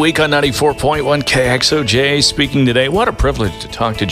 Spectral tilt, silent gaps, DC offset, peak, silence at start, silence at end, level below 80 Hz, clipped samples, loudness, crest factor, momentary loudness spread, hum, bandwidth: -4 dB/octave; none; under 0.1%; 0 dBFS; 0 s; 0 s; -30 dBFS; under 0.1%; -13 LUFS; 14 dB; 6 LU; none; 15.5 kHz